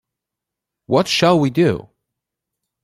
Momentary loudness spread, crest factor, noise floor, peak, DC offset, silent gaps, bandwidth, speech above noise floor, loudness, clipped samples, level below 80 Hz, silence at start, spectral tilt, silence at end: 5 LU; 18 dB; -84 dBFS; -2 dBFS; under 0.1%; none; 15 kHz; 68 dB; -16 LUFS; under 0.1%; -56 dBFS; 0.9 s; -5.5 dB/octave; 1.05 s